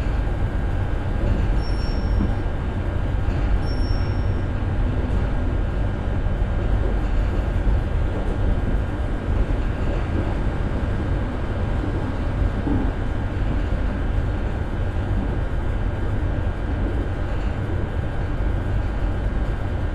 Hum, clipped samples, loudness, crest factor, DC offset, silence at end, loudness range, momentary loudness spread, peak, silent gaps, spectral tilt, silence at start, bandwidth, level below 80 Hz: none; under 0.1%; -25 LUFS; 14 dB; under 0.1%; 0 s; 1 LU; 3 LU; -8 dBFS; none; -8.5 dB/octave; 0 s; 7.4 kHz; -24 dBFS